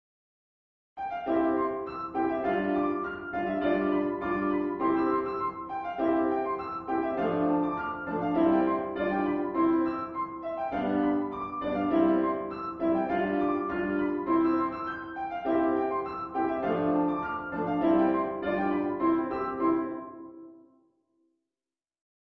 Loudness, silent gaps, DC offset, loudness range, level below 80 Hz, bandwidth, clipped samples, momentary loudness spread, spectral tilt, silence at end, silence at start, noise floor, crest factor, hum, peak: -29 LUFS; none; under 0.1%; 2 LU; -60 dBFS; 4.7 kHz; under 0.1%; 9 LU; -9.5 dB/octave; 1.75 s; 0.95 s; under -90 dBFS; 16 dB; none; -12 dBFS